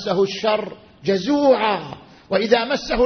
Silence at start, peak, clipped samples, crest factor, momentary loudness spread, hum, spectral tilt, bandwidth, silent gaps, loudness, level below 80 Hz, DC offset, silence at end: 0 s; -2 dBFS; under 0.1%; 18 dB; 14 LU; none; -5 dB/octave; 6.6 kHz; none; -20 LUFS; -46 dBFS; under 0.1%; 0 s